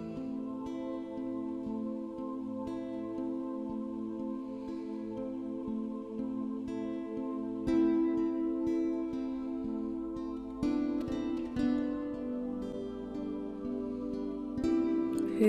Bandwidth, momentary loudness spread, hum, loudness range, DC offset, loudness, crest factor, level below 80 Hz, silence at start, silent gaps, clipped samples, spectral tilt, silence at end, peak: 9.6 kHz; 8 LU; none; 5 LU; under 0.1%; -36 LUFS; 20 dB; -58 dBFS; 0 s; none; under 0.1%; -7.5 dB/octave; 0 s; -16 dBFS